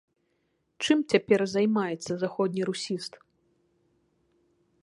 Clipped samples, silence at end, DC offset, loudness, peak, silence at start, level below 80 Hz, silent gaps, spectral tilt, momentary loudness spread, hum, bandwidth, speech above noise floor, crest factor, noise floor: under 0.1%; 1.75 s; under 0.1%; -27 LUFS; -6 dBFS; 0.8 s; -72 dBFS; none; -5 dB/octave; 10 LU; none; 11.5 kHz; 48 dB; 24 dB; -74 dBFS